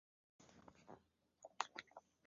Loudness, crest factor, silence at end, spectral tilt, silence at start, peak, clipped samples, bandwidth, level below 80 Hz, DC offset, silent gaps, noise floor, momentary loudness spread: -51 LUFS; 36 dB; 0.25 s; 0 dB/octave; 0.4 s; -20 dBFS; under 0.1%; 7.4 kHz; -86 dBFS; under 0.1%; none; -74 dBFS; 17 LU